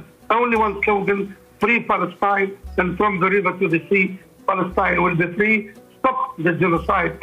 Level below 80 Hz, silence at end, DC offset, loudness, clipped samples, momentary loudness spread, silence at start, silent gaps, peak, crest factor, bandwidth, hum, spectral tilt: -44 dBFS; 0.05 s; under 0.1%; -19 LUFS; under 0.1%; 6 LU; 0 s; none; -4 dBFS; 14 dB; 14.5 kHz; none; -7.5 dB/octave